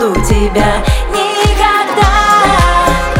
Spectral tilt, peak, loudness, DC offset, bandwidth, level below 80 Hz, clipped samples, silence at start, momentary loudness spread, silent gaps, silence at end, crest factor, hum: -4.5 dB/octave; 0 dBFS; -10 LUFS; under 0.1%; 16.5 kHz; -16 dBFS; under 0.1%; 0 s; 6 LU; none; 0 s; 10 dB; none